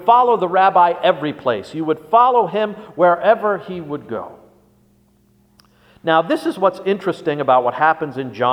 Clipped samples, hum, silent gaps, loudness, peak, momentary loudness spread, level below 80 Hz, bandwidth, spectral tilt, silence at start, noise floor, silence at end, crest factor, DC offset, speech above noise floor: under 0.1%; 60 Hz at -60 dBFS; none; -17 LUFS; 0 dBFS; 13 LU; -64 dBFS; 14.5 kHz; -6.5 dB/octave; 0 s; -56 dBFS; 0 s; 18 dB; under 0.1%; 39 dB